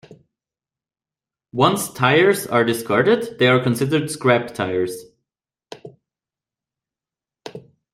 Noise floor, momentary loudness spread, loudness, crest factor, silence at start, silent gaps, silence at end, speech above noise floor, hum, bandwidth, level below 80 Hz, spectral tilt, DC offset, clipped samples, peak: under -90 dBFS; 22 LU; -18 LUFS; 20 dB; 1.55 s; none; 0.35 s; over 72 dB; none; 16 kHz; -62 dBFS; -5 dB/octave; under 0.1%; under 0.1%; -2 dBFS